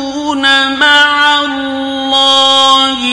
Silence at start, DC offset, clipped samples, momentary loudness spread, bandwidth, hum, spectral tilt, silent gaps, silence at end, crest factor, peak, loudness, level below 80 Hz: 0 s; under 0.1%; 0.3%; 10 LU; 12 kHz; none; -1 dB/octave; none; 0 s; 10 dB; 0 dBFS; -8 LUFS; -48 dBFS